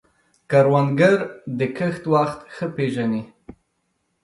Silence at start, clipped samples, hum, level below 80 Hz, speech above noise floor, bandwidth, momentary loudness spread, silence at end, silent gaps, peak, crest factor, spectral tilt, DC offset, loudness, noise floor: 0.5 s; under 0.1%; none; -60 dBFS; 52 dB; 11.5 kHz; 13 LU; 1 s; none; -2 dBFS; 18 dB; -7.5 dB/octave; under 0.1%; -21 LUFS; -71 dBFS